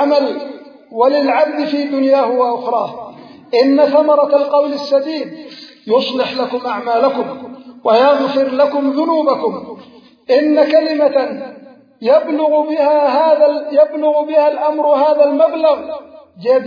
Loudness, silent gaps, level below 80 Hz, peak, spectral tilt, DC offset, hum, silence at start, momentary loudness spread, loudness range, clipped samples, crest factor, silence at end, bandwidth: -14 LUFS; none; -70 dBFS; 0 dBFS; -6 dB/octave; under 0.1%; none; 0 s; 16 LU; 3 LU; under 0.1%; 14 dB; 0 s; 5.4 kHz